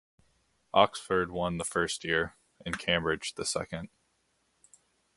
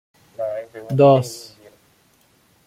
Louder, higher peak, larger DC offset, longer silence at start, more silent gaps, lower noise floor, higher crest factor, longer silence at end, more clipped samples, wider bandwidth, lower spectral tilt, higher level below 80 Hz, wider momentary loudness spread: second, -30 LUFS vs -18 LUFS; second, -6 dBFS vs -2 dBFS; neither; first, 0.75 s vs 0.4 s; neither; first, -74 dBFS vs -58 dBFS; first, 26 dB vs 18 dB; about the same, 1.3 s vs 1.25 s; neither; second, 12 kHz vs 15.5 kHz; second, -3.5 dB/octave vs -7 dB/octave; first, -56 dBFS vs -62 dBFS; second, 13 LU vs 17 LU